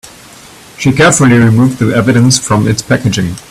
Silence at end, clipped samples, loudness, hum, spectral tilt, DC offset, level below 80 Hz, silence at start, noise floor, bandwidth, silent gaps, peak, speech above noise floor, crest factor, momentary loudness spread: 0.1 s; 0.1%; -9 LUFS; none; -5 dB/octave; under 0.1%; -38 dBFS; 0.05 s; -35 dBFS; 14 kHz; none; 0 dBFS; 26 dB; 10 dB; 7 LU